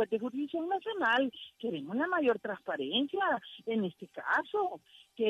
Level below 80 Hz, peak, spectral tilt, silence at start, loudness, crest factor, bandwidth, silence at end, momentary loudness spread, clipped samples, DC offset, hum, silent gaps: -78 dBFS; -18 dBFS; -6 dB/octave; 0 s; -33 LUFS; 14 dB; 12.5 kHz; 0 s; 9 LU; under 0.1%; under 0.1%; none; none